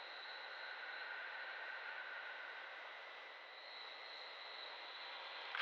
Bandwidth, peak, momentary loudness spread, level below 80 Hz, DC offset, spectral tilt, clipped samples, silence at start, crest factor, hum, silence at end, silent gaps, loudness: 7.6 kHz; -28 dBFS; 5 LU; under -90 dBFS; under 0.1%; 6 dB/octave; under 0.1%; 0 s; 24 dB; none; 0 s; none; -49 LUFS